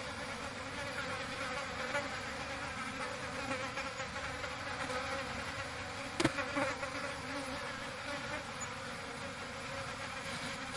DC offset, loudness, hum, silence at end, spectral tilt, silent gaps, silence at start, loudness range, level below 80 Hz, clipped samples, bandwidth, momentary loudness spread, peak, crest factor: under 0.1%; -39 LUFS; none; 0 s; -3.5 dB/octave; none; 0 s; 3 LU; -60 dBFS; under 0.1%; 11.5 kHz; 6 LU; -12 dBFS; 28 dB